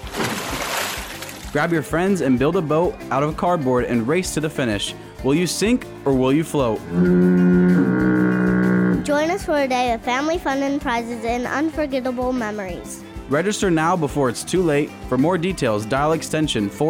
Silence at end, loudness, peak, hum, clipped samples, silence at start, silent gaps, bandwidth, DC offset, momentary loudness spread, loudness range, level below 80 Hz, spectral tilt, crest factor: 0 s; -20 LUFS; -6 dBFS; none; under 0.1%; 0 s; none; 16.5 kHz; under 0.1%; 7 LU; 5 LU; -40 dBFS; -5.5 dB/octave; 14 dB